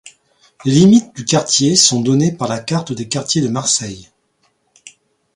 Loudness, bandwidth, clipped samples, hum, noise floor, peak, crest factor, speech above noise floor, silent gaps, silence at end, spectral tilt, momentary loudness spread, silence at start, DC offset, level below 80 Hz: -14 LUFS; 11.5 kHz; under 0.1%; none; -62 dBFS; 0 dBFS; 16 dB; 48 dB; none; 0.45 s; -4 dB/octave; 12 LU; 0.05 s; under 0.1%; -54 dBFS